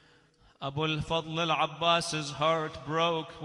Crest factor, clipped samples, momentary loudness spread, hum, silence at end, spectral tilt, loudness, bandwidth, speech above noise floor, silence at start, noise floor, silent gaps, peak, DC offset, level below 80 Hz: 20 dB; under 0.1%; 7 LU; none; 0 s; -4 dB/octave; -29 LUFS; 14 kHz; 32 dB; 0.6 s; -62 dBFS; none; -12 dBFS; under 0.1%; -58 dBFS